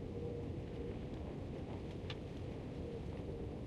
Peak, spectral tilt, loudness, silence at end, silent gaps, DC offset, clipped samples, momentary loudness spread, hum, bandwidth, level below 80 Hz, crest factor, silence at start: -30 dBFS; -8 dB/octave; -46 LUFS; 0 s; none; under 0.1%; under 0.1%; 2 LU; none; 11.5 kHz; -52 dBFS; 16 dB; 0 s